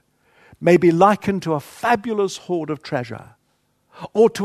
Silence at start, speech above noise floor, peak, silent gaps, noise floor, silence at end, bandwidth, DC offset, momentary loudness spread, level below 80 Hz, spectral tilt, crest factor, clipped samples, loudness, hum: 0.6 s; 48 dB; 0 dBFS; none; -66 dBFS; 0 s; 13.5 kHz; under 0.1%; 12 LU; -58 dBFS; -6.5 dB/octave; 20 dB; under 0.1%; -19 LUFS; none